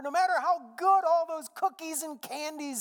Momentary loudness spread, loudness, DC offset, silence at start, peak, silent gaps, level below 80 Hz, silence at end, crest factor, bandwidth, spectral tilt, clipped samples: 12 LU; -29 LUFS; under 0.1%; 0 s; -14 dBFS; none; under -90 dBFS; 0 s; 16 dB; 19 kHz; -1 dB/octave; under 0.1%